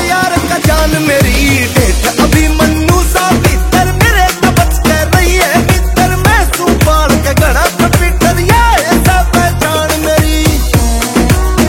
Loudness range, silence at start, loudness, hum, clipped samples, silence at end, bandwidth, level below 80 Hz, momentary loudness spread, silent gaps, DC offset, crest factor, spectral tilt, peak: 0 LU; 0 s; -9 LUFS; none; 0.6%; 0 s; 17 kHz; -14 dBFS; 3 LU; none; under 0.1%; 8 dB; -4.5 dB/octave; 0 dBFS